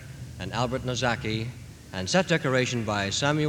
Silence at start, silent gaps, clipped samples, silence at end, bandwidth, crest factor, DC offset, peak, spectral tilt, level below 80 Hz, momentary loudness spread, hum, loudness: 0 s; none; under 0.1%; 0 s; 18.5 kHz; 20 dB; under 0.1%; -6 dBFS; -4.5 dB/octave; -50 dBFS; 14 LU; none; -27 LUFS